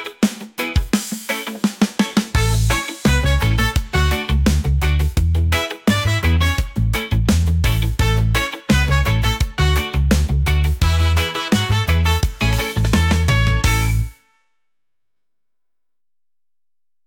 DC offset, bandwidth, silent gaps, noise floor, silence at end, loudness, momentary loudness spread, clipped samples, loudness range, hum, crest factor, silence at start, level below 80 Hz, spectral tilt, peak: under 0.1%; 17 kHz; none; under -90 dBFS; 2.95 s; -18 LUFS; 5 LU; under 0.1%; 3 LU; none; 14 dB; 0 s; -22 dBFS; -5 dB/octave; -4 dBFS